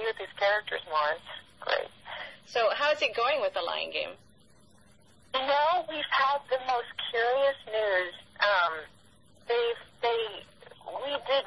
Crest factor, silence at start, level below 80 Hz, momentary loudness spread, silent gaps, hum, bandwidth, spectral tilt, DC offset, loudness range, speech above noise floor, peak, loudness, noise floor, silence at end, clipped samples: 18 dB; 0 s; -70 dBFS; 13 LU; none; none; 11.5 kHz; -2.5 dB/octave; under 0.1%; 2 LU; 32 dB; -12 dBFS; -29 LUFS; -60 dBFS; 0 s; under 0.1%